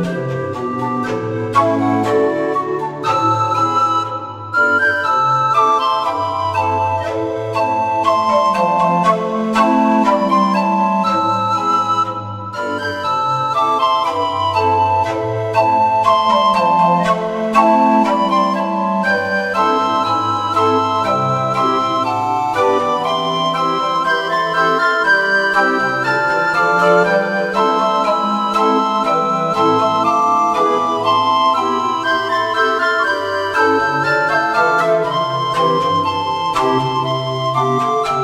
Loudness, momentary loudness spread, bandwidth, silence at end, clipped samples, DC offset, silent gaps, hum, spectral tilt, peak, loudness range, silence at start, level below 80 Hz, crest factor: -15 LUFS; 6 LU; 15 kHz; 0 s; under 0.1%; under 0.1%; none; none; -5.5 dB/octave; 0 dBFS; 3 LU; 0 s; -54 dBFS; 14 dB